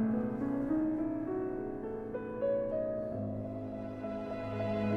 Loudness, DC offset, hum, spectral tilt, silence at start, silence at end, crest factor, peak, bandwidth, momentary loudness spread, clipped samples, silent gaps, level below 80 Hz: -36 LUFS; under 0.1%; none; -9.5 dB/octave; 0 s; 0 s; 12 dB; -22 dBFS; 6.2 kHz; 7 LU; under 0.1%; none; -56 dBFS